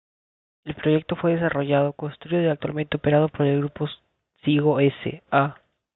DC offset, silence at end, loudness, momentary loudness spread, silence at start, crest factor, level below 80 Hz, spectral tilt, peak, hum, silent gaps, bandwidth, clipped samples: under 0.1%; 0.4 s; -23 LUFS; 11 LU; 0.65 s; 18 dB; -58 dBFS; -11.5 dB/octave; -6 dBFS; none; none; 4.1 kHz; under 0.1%